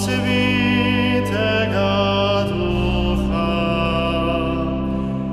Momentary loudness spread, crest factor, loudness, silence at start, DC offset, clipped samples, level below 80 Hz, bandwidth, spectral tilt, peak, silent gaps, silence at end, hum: 5 LU; 14 dB; -19 LUFS; 0 s; under 0.1%; under 0.1%; -30 dBFS; 14 kHz; -6 dB/octave; -6 dBFS; none; 0 s; none